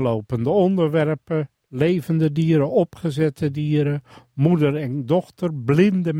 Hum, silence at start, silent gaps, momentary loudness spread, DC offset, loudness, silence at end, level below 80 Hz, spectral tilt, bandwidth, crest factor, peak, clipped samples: none; 0 s; none; 8 LU; under 0.1%; -21 LUFS; 0 s; -56 dBFS; -8.5 dB/octave; 12 kHz; 16 dB; -4 dBFS; under 0.1%